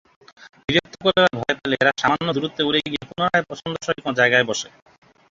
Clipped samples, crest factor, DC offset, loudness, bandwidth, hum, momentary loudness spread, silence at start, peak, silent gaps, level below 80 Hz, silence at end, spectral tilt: under 0.1%; 20 dB; under 0.1%; -20 LUFS; 7.8 kHz; none; 11 LU; 0.7 s; -2 dBFS; none; -56 dBFS; 0.65 s; -4 dB/octave